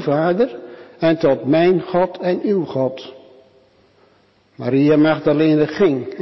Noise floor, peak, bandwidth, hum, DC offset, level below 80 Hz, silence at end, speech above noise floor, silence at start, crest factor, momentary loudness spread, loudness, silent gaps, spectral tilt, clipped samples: -56 dBFS; -6 dBFS; 6 kHz; none; under 0.1%; -58 dBFS; 0 s; 39 dB; 0 s; 12 dB; 11 LU; -17 LUFS; none; -8.5 dB/octave; under 0.1%